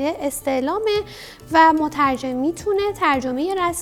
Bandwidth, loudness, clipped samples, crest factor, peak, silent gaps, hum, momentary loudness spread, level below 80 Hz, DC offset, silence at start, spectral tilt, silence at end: 17.5 kHz; -20 LUFS; under 0.1%; 18 dB; -2 dBFS; none; none; 9 LU; -48 dBFS; under 0.1%; 0 s; -4 dB/octave; 0 s